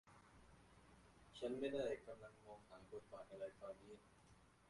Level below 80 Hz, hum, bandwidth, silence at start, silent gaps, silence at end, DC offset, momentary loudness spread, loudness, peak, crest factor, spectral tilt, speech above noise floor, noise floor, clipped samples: -76 dBFS; 60 Hz at -75 dBFS; 11.5 kHz; 0.05 s; none; 0 s; under 0.1%; 23 LU; -51 LUFS; -32 dBFS; 20 dB; -5.5 dB/octave; 20 dB; -71 dBFS; under 0.1%